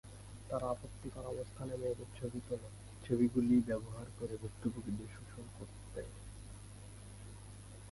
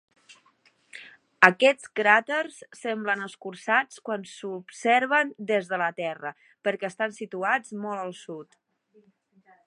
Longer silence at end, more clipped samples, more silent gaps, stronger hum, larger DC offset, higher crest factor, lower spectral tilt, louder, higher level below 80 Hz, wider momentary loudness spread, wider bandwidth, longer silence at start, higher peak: second, 0 s vs 1.25 s; neither; neither; first, 50 Hz at -50 dBFS vs none; neither; second, 20 dB vs 28 dB; first, -7 dB/octave vs -4 dB/octave; second, -39 LUFS vs -25 LUFS; first, -56 dBFS vs -80 dBFS; about the same, 20 LU vs 18 LU; about the same, 11.5 kHz vs 11.5 kHz; second, 0.05 s vs 0.95 s; second, -20 dBFS vs 0 dBFS